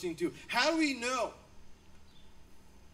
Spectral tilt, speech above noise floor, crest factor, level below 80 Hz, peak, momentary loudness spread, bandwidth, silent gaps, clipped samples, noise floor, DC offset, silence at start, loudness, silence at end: -3 dB/octave; 21 dB; 22 dB; -62 dBFS; -14 dBFS; 9 LU; 16 kHz; none; under 0.1%; -54 dBFS; under 0.1%; 0 s; -32 LUFS; 0.05 s